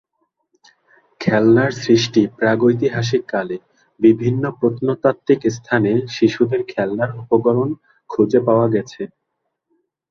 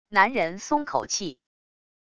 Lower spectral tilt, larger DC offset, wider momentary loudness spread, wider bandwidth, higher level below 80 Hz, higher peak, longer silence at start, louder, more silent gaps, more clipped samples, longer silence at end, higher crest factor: first, -6.5 dB/octave vs -2.5 dB/octave; neither; about the same, 9 LU vs 8 LU; second, 7.2 kHz vs 10.5 kHz; first, -56 dBFS vs -62 dBFS; about the same, -2 dBFS vs -4 dBFS; first, 1.2 s vs 0.05 s; first, -17 LUFS vs -25 LUFS; neither; neither; first, 1.05 s vs 0.65 s; second, 16 dB vs 22 dB